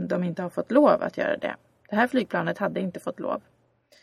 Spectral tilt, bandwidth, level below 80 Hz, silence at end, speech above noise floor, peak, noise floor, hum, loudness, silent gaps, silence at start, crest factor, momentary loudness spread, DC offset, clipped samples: -7 dB/octave; 13 kHz; -68 dBFS; 0.65 s; 36 dB; -4 dBFS; -61 dBFS; none; -26 LUFS; none; 0 s; 22 dB; 12 LU; under 0.1%; under 0.1%